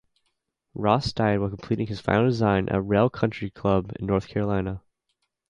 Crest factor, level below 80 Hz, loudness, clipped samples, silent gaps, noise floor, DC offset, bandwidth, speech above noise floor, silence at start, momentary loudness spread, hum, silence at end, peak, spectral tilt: 20 dB; -46 dBFS; -25 LUFS; under 0.1%; none; -77 dBFS; under 0.1%; 10 kHz; 53 dB; 0.75 s; 7 LU; none; 0.7 s; -4 dBFS; -7.5 dB/octave